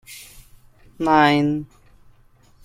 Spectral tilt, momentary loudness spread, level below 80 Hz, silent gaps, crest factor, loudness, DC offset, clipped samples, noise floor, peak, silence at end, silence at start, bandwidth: -6 dB/octave; 24 LU; -52 dBFS; none; 20 dB; -18 LUFS; under 0.1%; under 0.1%; -53 dBFS; -2 dBFS; 1 s; 0.1 s; 16 kHz